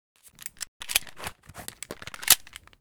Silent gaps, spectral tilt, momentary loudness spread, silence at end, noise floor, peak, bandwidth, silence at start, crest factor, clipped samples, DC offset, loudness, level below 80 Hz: 0.68-0.80 s; 1 dB/octave; 21 LU; 0.45 s; -45 dBFS; 0 dBFS; over 20 kHz; 0.4 s; 32 dB; under 0.1%; under 0.1%; -23 LUFS; -58 dBFS